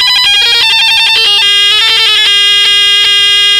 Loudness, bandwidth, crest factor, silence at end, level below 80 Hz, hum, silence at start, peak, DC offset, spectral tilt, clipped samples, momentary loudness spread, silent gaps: -4 LUFS; 16 kHz; 6 dB; 0 s; -44 dBFS; none; 0 s; 0 dBFS; under 0.1%; 2 dB/octave; under 0.1%; 1 LU; none